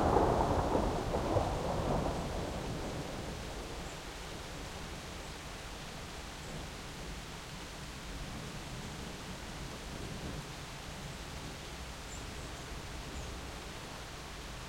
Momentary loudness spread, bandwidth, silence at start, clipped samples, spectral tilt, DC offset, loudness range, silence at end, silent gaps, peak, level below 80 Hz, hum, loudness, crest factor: 11 LU; 16 kHz; 0 s; under 0.1%; -5 dB/octave; under 0.1%; 8 LU; 0 s; none; -12 dBFS; -46 dBFS; none; -40 LUFS; 26 dB